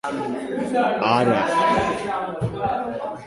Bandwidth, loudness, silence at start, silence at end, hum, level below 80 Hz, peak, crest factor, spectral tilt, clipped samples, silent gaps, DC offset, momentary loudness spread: 11.5 kHz; -22 LUFS; 0.05 s; 0 s; none; -50 dBFS; -4 dBFS; 18 dB; -6 dB/octave; under 0.1%; none; under 0.1%; 8 LU